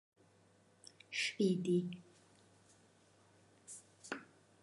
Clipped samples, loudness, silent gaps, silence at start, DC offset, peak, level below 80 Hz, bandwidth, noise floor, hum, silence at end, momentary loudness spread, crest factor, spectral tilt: under 0.1%; -38 LUFS; none; 1.1 s; under 0.1%; -22 dBFS; -86 dBFS; 11.5 kHz; -69 dBFS; none; 0.4 s; 25 LU; 20 dB; -5 dB/octave